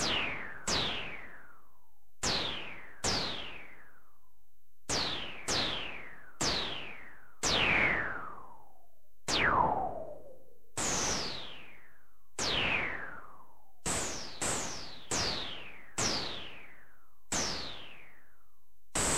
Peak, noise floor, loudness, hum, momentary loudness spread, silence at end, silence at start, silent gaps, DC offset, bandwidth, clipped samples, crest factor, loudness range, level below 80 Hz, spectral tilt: -16 dBFS; -75 dBFS; -33 LUFS; none; 19 LU; 0 s; 0 s; none; 0.9%; 16 kHz; under 0.1%; 22 dB; 6 LU; -54 dBFS; -1.5 dB/octave